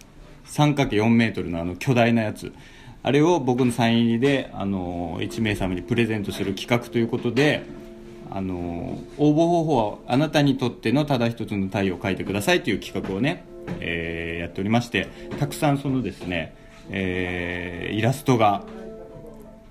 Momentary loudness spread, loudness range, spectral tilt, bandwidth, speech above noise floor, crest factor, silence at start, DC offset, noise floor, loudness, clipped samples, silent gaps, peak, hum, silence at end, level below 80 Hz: 13 LU; 4 LU; -6 dB/octave; 15.5 kHz; 22 dB; 20 dB; 0.15 s; under 0.1%; -45 dBFS; -23 LUFS; under 0.1%; none; -4 dBFS; none; 0.1 s; -46 dBFS